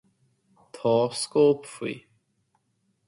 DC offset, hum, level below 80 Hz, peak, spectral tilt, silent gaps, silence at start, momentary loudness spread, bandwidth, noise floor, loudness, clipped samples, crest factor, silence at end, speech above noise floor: under 0.1%; none; -72 dBFS; -10 dBFS; -5 dB/octave; none; 0.75 s; 13 LU; 11.5 kHz; -72 dBFS; -25 LUFS; under 0.1%; 18 dB; 1.1 s; 49 dB